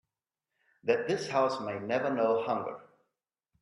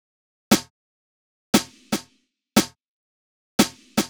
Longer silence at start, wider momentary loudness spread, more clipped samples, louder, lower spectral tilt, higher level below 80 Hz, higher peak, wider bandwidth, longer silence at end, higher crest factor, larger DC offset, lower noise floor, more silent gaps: first, 0.85 s vs 0.5 s; about the same, 9 LU vs 8 LU; neither; second, -31 LUFS vs -23 LUFS; first, -5.5 dB/octave vs -3.5 dB/octave; second, -78 dBFS vs -54 dBFS; second, -12 dBFS vs -2 dBFS; second, 11.5 kHz vs over 20 kHz; first, 0.8 s vs 0 s; about the same, 20 dB vs 24 dB; neither; first, -89 dBFS vs -66 dBFS; second, none vs 0.70-1.53 s, 2.88-3.59 s